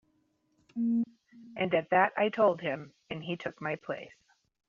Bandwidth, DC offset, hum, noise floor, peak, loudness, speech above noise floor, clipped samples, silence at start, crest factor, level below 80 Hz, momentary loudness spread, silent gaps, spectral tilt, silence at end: 7 kHz; under 0.1%; none; -73 dBFS; -12 dBFS; -31 LUFS; 43 dB; under 0.1%; 0.75 s; 20 dB; -76 dBFS; 15 LU; none; -4 dB/octave; 0.6 s